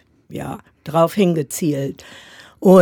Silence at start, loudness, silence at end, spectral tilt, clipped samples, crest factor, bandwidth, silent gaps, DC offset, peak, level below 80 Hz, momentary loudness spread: 0.3 s; -19 LUFS; 0 s; -6.5 dB/octave; under 0.1%; 18 dB; 19.5 kHz; none; under 0.1%; 0 dBFS; -56 dBFS; 21 LU